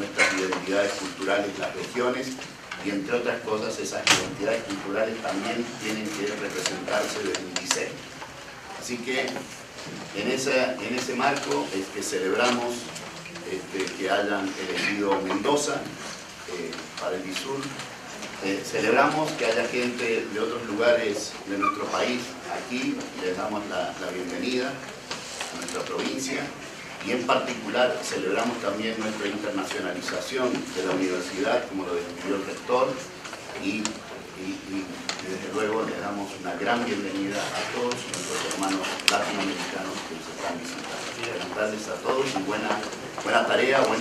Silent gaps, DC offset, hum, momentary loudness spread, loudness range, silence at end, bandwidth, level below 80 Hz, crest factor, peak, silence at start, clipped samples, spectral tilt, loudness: none; under 0.1%; none; 11 LU; 4 LU; 0 s; 15.5 kHz; -64 dBFS; 28 dB; 0 dBFS; 0 s; under 0.1%; -3 dB/octave; -27 LUFS